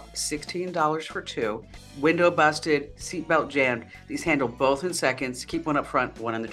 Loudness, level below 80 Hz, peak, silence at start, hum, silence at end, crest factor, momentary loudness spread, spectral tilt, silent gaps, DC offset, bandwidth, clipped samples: -25 LUFS; -52 dBFS; -6 dBFS; 0 s; none; 0 s; 20 dB; 11 LU; -4 dB/octave; none; under 0.1%; 14 kHz; under 0.1%